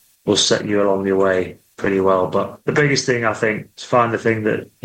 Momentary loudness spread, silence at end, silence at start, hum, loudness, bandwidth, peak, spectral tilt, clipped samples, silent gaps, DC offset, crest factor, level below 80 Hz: 6 LU; 0.2 s; 0.25 s; none; -18 LUFS; 15.5 kHz; -2 dBFS; -4 dB/octave; under 0.1%; none; under 0.1%; 16 dB; -56 dBFS